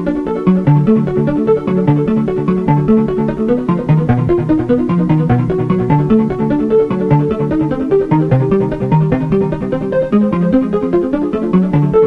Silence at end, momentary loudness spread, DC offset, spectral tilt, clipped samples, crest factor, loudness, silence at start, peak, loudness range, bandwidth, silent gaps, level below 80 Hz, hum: 0 s; 4 LU; under 0.1%; -10.5 dB/octave; under 0.1%; 12 dB; -14 LUFS; 0 s; -2 dBFS; 1 LU; 5 kHz; none; -34 dBFS; none